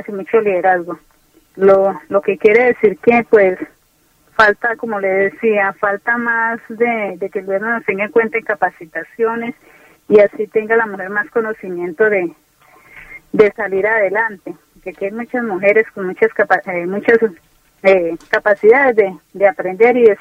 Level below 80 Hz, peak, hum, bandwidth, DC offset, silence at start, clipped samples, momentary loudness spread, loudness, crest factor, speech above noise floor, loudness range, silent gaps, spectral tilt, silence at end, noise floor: -56 dBFS; 0 dBFS; none; 7.2 kHz; under 0.1%; 0.1 s; under 0.1%; 13 LU; -15 LUFS; 16 dB; 41 dB; 4 LU; none; -7 dB/octave; 0.05 s; -56 dBFS